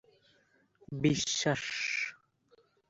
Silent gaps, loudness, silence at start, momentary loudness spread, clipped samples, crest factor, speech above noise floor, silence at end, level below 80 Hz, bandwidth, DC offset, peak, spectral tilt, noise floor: none; -32 LUFS; 0.9 s; 8 LU; under 0.1%; 20 dB; 38 dB; 0.75 s; -66 dBFS; 8 kHz; under 0.1%; -14 dBFS; -3.5 dB/octave; -70 dBFS